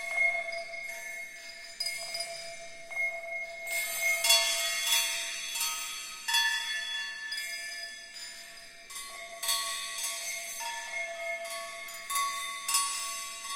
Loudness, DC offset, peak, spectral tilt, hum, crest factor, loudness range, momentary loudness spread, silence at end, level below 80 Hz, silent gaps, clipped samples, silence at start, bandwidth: -31 LUFS; under 0.1%; -8 dBFS; 3.5 dB/octave; none; 26 dB; 8 LU; 15 LU; 0 s; -68 dBFS; none; under 0.1%; 0 s; 17 kHz